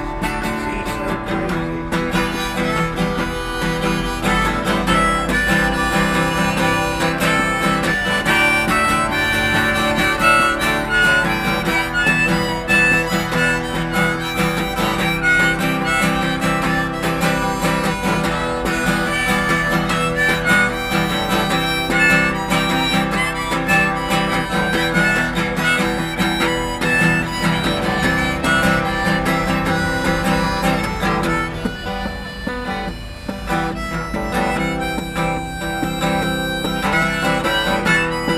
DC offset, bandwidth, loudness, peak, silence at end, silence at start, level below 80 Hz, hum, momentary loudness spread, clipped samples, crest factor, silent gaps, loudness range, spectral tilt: under 0.1%; 16 kHz; -17 LUFS; 0 dBFS; 0 s; 0 s; -32 dBFS; none; 8 LU; under 0.1%; 18 dB; none; 6 LU; -4.5 dB/octave